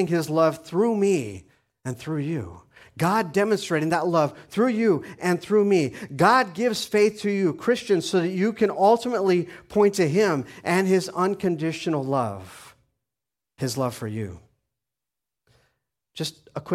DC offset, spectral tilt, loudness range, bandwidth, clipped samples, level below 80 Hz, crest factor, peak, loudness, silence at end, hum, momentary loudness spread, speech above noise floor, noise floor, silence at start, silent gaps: under 0.1%; -5.5 dB/octave; 11 LU; 15.5 kHz; under 0.1%; -62 dBFS; 20 dB; -4 dBFS; -23 LUFS; 0 s; none; 12 LU; 65 dB; -88 dBFS; 0 s; none